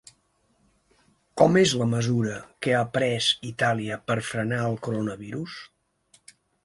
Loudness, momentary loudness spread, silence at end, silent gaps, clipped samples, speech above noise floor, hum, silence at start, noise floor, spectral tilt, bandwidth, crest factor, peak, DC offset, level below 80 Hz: -25 LUFS; 14 LU; 1 s; none; under 0.1%; 43 dB; none; 1.35 s; -68 dBFS; -5 dB/octave; 11.5 kHz; 22 dB; -4 dBFS; under 0.1%; -60 dBFS